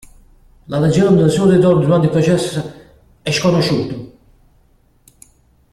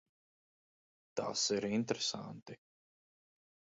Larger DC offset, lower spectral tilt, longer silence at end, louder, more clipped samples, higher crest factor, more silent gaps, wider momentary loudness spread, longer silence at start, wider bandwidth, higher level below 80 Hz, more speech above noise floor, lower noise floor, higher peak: neither; first, -6.5 dB/octave vs -3.5 dB/octave; first, 1.65 s vs 1.25 s; first, -14 LUFS vs -36 LUFS; neither; second, 14 dB vs 24 dB; second, none vs 2.42-2.46 s; second, 14 LU vs 19 LU; second, 0.7 s vs 1.15 s; first, 13.5 kHz vs 7.6 kHz; first, -46 dBFS vs -78 dBFS; second, 40 dB vs over 53 dB; second, -54 dBFS vs under -90 dBFS; first, -2 dBFS vs -18 dBFS